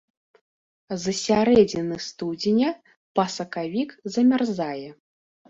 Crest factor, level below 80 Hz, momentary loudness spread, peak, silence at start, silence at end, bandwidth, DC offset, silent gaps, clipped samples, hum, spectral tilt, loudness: 20 dB; -60 dBFS; 13 LU; -4 dBFS; 0.9 s; 0.55 s; 7.8 kHz; under 0.1%; 2.97-3.15 s; under 0.1%; none; -5 dB/octave; -23 LUFS